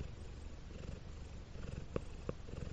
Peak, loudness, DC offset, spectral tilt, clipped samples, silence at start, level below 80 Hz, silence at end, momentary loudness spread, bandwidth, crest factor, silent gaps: -22 dBFS; -49 LUFS; under 0.1%; -6.5 dB/octave; under 0.1%; 0 s; -50 dBFS; 0 s; 7 LU; 8.8 kHz; 24 dB; none